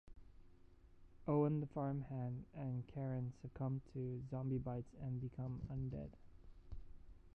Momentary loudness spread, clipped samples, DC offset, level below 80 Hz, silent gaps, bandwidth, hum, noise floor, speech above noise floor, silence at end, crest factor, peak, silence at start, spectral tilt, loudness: 12 LU; under 0.1%; under 0.1%; -62 dBFS; none; 3.2 kHz; none; -64 dBFS; 21 dB; 0.05 s; 20 dB; -26 dBFS; 0.05 s; -11 dB/octave; -44 LUFS